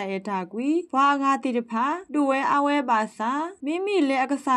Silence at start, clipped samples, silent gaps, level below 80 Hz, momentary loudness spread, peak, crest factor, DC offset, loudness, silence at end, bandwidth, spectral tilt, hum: 0 s; under 0.1%; none; -78 dBFS; 7 LU; -10 dBFS; 14 dB; under 0.1%; -24 LUFS; 0 s; 11 kHz; -5 dB/octave; none